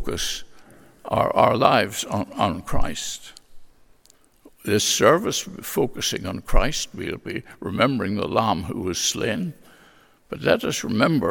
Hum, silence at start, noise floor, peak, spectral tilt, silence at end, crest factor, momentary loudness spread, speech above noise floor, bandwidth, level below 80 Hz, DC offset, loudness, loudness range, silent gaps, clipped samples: none; 0 s; -56 dBFS; 0 dBFS; -4 dB/octave; 0 s; 22 dB; 14 LU; 34 dB; 17.5 kHz; -34 dBFS; under 0.1%; -23 LUFS; 2 LU; none; under 0.1%